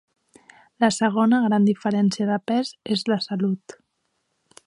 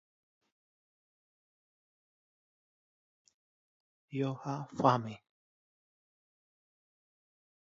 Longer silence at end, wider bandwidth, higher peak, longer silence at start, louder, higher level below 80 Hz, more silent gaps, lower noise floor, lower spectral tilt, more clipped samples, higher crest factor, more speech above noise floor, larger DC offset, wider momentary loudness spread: second, 1.1 s vs 2.6 s; first, 11 kHz vs 7.4 kHz; first, -4 dBFS vs -10 dBFS; second, 0.8 s vs 4.1 s; first, -22 LUFS vs -34 LUFS; first, -70 dBFS vs -80 dBFS; neither; second, -74 dBFS vs under -90 dBFS; about the same, -5.5 dB/octave vs -6.5 dB/octave; neither; second, 18 dB vs 30 dB; second, 52 dB vs over 57 dB; neither; second, 7 LU vs 16 LU